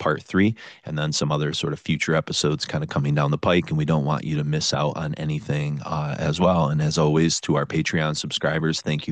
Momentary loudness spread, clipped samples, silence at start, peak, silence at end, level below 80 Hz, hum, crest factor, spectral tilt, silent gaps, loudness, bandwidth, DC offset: 7 LU; under 0.1%; 0 s; -6 dBFS; 0 s; -52 dBFS; none; 18 dB; -5 dB/octave; none; -23 LUFS; 9.2 kHz; under 0.1%